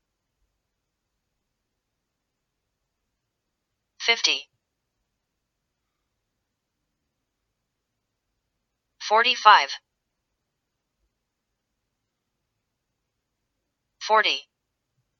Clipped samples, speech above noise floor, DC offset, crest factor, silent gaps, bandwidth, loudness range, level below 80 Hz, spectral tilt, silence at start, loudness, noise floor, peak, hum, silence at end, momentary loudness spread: under 0.1%; 61 dB; under 0.1%; 30 dB; none; 7.2 kHz; 9 LU; -84 dBFS; 1.5 dB/octave; 4 s; -20 LUFS; -81 dBFS; 0 dBFS; none; 0.8 s; 18 LU